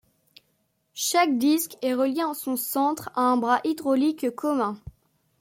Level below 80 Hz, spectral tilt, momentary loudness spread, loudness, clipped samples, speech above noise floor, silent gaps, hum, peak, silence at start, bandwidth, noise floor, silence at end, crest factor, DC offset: -62 dBFS; -3 dB/octave; 7 LU; -24 LUFS; under 0.1%; 47 dB; none; none; -8 dBFS; 0.95 s; 16.5 kHz; -71 dBFS; 0.5 s; 16 dB; under 0.1%